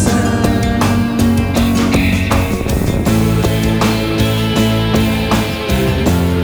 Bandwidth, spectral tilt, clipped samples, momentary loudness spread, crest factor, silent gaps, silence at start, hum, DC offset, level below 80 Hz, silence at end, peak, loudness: over 20 kHz; -6 dB/octave; under 0.1%; 2 LU; 12 dB; none; 0 s; none; under 0.1%; -24 dBFS; 0 s; 0 dBFS; -14 LUFS